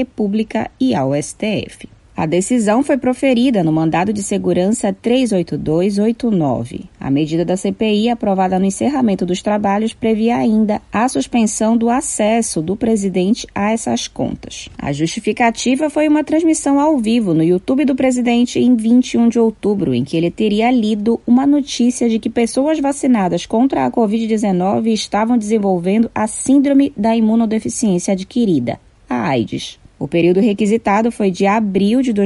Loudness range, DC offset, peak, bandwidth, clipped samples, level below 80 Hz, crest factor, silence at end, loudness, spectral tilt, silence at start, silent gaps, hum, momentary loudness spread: 3 LU; under 0.1%; -4 dBFS; 11.5 kHz; under 0.1%; -46 dBFS; 12 dB; 0 s; -16 LUFS; -5.5 dB/octave; 0 s; none; none; 6 LU